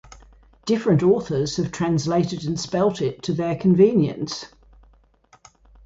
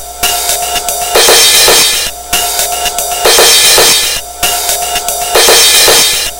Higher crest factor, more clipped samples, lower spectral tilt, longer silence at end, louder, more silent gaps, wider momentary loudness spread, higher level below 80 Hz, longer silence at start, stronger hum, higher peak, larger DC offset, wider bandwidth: first, 18 dB vs 8 dB; second, under 0.1% vs 3%; first, -6.5 dB/octave vs 0.5 dB/octave; first, 1.4 s vs 0 s; second, -21 LUFS vs -5 LUFS; neither; first, 13 LU vs 10 LU; second, -52 dBFS vs -32 dBFS; about the same, 0.1 s vs 0 s; neither; second, -4 dBFS vs 0 dBFS; neither; second, 8 kHz vs over 20 kHz